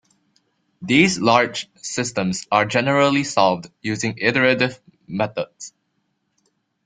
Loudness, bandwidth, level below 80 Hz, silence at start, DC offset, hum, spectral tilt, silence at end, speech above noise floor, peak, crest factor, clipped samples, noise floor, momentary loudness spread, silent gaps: -19 LUFS; 9.6 kHz; -60 dBFS; 0.8 s; under 0.1%; none; -4.5 dB/octave; 1.15 s; 51 dB; -2 dBFS; 20 dB; under 0.1%; -71 dBFS; 13 LU; none